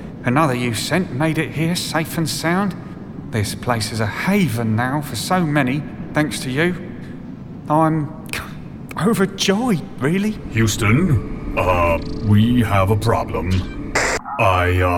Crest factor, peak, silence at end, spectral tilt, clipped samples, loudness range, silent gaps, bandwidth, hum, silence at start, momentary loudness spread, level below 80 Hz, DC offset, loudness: 14 dB; -4 dBFS; 0 s; -5.5 dB/octave; under 0.1%; 4 LU; none; 18 kHz; none; 0 s; 11 LU; -36 dBFS; under 0.1%; -19 LUFS